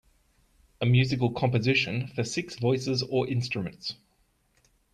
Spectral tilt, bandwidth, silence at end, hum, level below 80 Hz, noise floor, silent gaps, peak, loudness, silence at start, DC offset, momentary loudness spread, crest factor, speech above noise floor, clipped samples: -6 dB/octave; 9.6 kHz; 1 s; none; -60 dBFS; -69 dBFS; none; -12 dBFS; -27 LUFS; 0.8 s; under 0.1%; 10 LU; 16 dB; 42 dB; under 0.1%